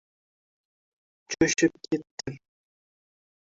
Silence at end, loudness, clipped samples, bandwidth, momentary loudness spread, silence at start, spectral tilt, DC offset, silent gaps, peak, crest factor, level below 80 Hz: 1.2 s; -26 LUFS; under 0.1%; 7.8 kHz; 17 LU; 1.3 s; -4.5 dB/octave; under 0.1%; 2.11-2.17 s; -10 dBFS; 22 dB; -60 dBFS